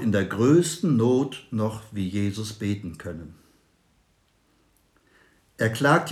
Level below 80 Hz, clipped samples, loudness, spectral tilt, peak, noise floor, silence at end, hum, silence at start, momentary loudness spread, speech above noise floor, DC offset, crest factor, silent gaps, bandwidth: -62 dBFS; under 0.1%; -24 LUFS; -6 dB/octave; -6 dBFS; -65 dBFS; 0 s; none; 0 s; 16 LU; 42 dB; under 0.1%; 20 dB; none; 14.5 kHz